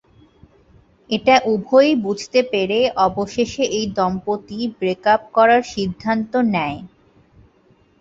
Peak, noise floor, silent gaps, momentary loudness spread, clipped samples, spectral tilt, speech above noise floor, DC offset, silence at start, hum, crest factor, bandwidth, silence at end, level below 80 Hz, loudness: -2 dBFS; -56 dBFS; none; 10 LU; under 0.1%; -5 dB/octave; 38 dB; under 0.1%; 1.1 s; none; 18 dB; 7.8 kHz; 1.15 s; -52 dBFS; -18 LUFS